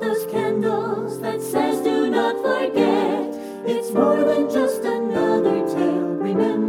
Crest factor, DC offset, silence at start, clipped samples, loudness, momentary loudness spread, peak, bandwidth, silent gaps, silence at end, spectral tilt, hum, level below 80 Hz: 14 dB; under 0.1%; 0 s; under 0.1%; -21 LUFS; 7 LU; -6 dBFS; 16 kHz; none; 0 s; -6 dB/octave; none; -62 dBFS